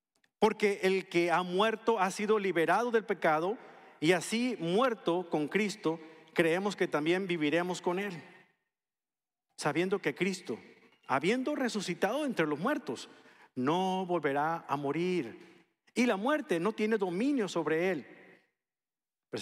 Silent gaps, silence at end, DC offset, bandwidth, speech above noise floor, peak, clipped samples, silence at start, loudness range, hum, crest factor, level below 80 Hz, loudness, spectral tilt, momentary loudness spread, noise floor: none; 0 s; under 0.1%; 14.5 kHz; over 59 dB; -12 dBFS; under 0.1%; 0.4 s; 5 LU; none; 20 dB; -82 dBFS; -31 LUFS; -5 dB/octave; 8 LU; under -90 dBFS